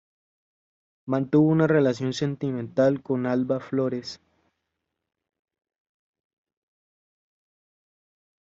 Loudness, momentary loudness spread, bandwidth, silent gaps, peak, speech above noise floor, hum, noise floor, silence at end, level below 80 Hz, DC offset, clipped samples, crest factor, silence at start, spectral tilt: -24 LUFS; 12 LU; 7.8 kHz; none; -8 dBFS; 59 dB; none; -82 dBFS; 4.25 s; -68 dBFS; under 0.1%; under 0.1%; 20 dB; 1.05 s; -7 dB/octave